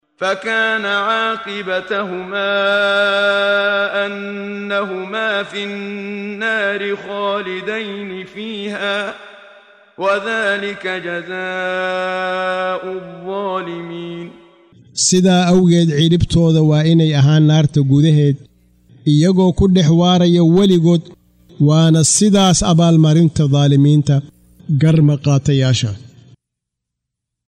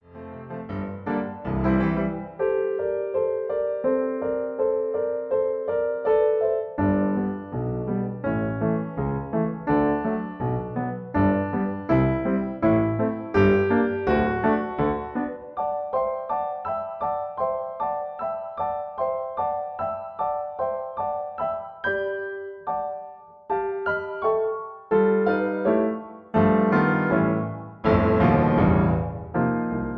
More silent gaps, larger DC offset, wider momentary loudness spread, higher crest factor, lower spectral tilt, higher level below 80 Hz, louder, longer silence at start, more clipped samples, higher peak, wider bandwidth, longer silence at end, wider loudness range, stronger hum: neither; neither; first, 14 LU vs 10 LU; second, 12 dB vs 20 dB; second, -5.5 dB/octave vs -10.5 dB/octave; about the same, -40 dBFS vs -44 dBFS; first, -15 LUFS vs -25 LUFS; about the same, 0.2 s vs 0.1 s; neither; first, -2 dBFS vs -6 dBFS; first, 11 kHz vs 5.8 kHz; first, 1.4 s vs 0 s; about the same, 9 LU vs 7 LU; neither